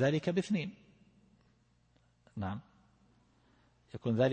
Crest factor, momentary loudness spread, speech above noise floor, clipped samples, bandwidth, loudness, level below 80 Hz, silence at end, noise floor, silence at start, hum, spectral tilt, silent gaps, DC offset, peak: 20 dB; 17 LU; 38 dB; under 0.1%; 8.8 kHz; -36 LUFS; -70 dBFS; 0 s; -70 dBFS; 0 s; none; -7 dB/octave; none; under 0.1%; -16 dBFS